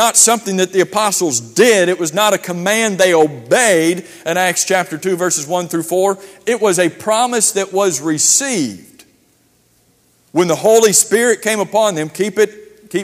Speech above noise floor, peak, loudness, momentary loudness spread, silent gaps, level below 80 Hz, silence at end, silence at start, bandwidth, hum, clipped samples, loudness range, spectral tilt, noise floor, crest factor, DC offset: 41 dB; 0 dBFS; -14 LUFS; 8 LU; none; -64 dBFS; 0 s; 0 s; 15.5 kHz; none; under 0.1%; 3 LU; -2.5 dB/octave; -56 dBFS; 14 dB; under 0.1%